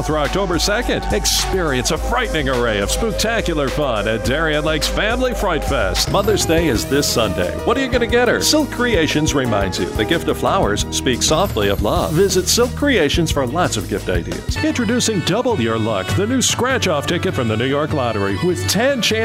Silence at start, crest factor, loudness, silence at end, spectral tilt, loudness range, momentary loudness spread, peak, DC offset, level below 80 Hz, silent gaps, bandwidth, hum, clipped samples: 0 s; 16 dB; -17 LUFS; 0 s; -4 dB/octave; 2 LU; 4 LU; -2 dBFS; under 0.1%; -28 dBFS; none; 16 kHz; none; under 0.1%